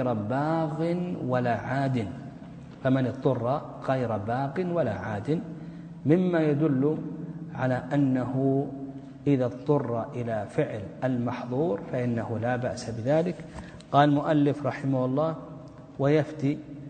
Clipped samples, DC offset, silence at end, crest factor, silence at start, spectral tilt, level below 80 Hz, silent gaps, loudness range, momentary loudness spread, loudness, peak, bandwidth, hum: under 0.1%; under 0.1%; 0 s; 20 dB; 0 s; -8.5 dB/octave; -58 dBFS; none; 3 LU; 13 LU; -27 LUFS; -6 dBFS; 9 kHz; none